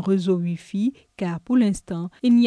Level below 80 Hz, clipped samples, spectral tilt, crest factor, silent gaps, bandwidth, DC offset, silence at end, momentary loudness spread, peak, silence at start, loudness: -54 dBFS; under 0.1%; -7.5 dB/octave; 12 dB; none; 11 kHz; under 0.1%; 0 s; 9 LU; -10 dBFS; 0 s; -24 LUFS